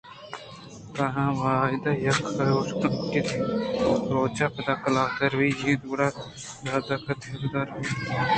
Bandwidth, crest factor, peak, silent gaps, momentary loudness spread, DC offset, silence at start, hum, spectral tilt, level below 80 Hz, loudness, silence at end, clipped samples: 9.2 kHz; 18 dB; -8 dBFS; none; 14 LU; under 0.1%; 0.05 s; none; -6 dB/octave; -54 dBFS; -26 LUFS; 0 s; under 0.1%